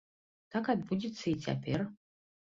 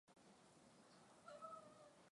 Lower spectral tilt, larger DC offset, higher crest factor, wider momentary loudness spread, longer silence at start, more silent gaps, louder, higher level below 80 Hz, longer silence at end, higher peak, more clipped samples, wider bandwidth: first, -6.5 dB/octave vs -4 dB/octave; neither; about the same, 20 dB vs 20 dB; second, 5 LU vs 12 LU; first, 0.5 s vs 0.05 s; neither; first, -35 LUFS vs -63 LUFS; first, -66 dBFS vs under -90 dBFS; first, 0.55 s vs 0 s; first, -18 dBFS vs -44 dBFS; neither; second, 7.6 kHz vs 11 kHz